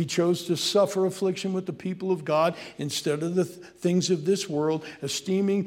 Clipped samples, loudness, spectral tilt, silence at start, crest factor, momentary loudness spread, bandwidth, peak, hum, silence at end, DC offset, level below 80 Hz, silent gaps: under 0.1%; -26 LUFS; -5 dB/octave; 0 s; 16 dB; 8 LU; 16.5 kHz; -10 dBFS; none; 0 s; under 0.1%; -72 dBFS; none